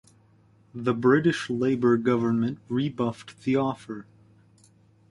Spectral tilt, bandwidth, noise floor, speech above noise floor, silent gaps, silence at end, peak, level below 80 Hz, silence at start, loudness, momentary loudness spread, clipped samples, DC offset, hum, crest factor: -7 dB/octave; 11.5 kHz; -59 dBFS; 34 dB; none; 1.1 s; -8 dBFS; -64 dBFS; 0.75 s; -25 LUFS; 14 LU; under 0.1%; under 0.1%; none; 20 dB